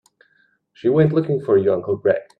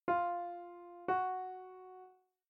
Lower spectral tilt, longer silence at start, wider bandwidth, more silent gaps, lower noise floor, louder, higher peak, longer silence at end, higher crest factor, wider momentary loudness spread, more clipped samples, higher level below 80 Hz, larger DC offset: first, -10 dB/octave vs -8 dB/octave; first, 0.85 s vs 0.05 s; about the same, 4.6 kHz vs 4.7 kHz; neither; about the same, -62 dBFS vs -61 dBFS; first, -19 LUFS vs -39 LUFS; first, -2 dBFS vs -22 dBFS; second, 0.15 s vs 0.35 s; about the same, 18 dB vs 18 dB; second, 4 LU vs 19 LU; neither; first, -60 dBFS vs -80 dBFS; neither